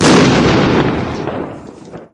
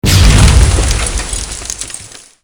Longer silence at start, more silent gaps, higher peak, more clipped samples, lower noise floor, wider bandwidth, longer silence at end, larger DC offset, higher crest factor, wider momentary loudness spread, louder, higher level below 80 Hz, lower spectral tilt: about the same, 0 s vs 0.05 s; neither; about the same, 0 dBFS vs 0 dBFS; second, under 0.1% vs 0.8%; about the same, -33 dBFS vs -31 dBFS; second, 11.5 kHz vs over 20 kHz; second, 0.1 s vs 0.35 s; neither; about the same, 12 dB vs 10 dB; first, 23 LU vs 16 LU; about the same, -12 LUFS vs -11 LUFS; second, -32 dBFS vs -14 dBFS; about the same, -5 dB/octave vs -4 dB/octave